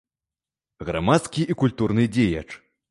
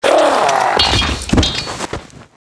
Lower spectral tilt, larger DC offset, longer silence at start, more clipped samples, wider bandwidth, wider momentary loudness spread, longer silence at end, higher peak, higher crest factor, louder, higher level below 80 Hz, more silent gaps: first, -6.5 dB/octave vs -3.5 dB/octave; neither; first, 0.8 s vs 0 s; neither; about the same, 11.5 kHz vs 11 kHz; first, 16 LU vs 13 LU; about the same, 0.35 s vs 0.25 s; second, -4 dBFS vs 0 dBFS; first, 20 dB vs 14 dB; second, -22 LUFS vs -14 LUFS; second, -46 dBFS vs -26 dBFS; neither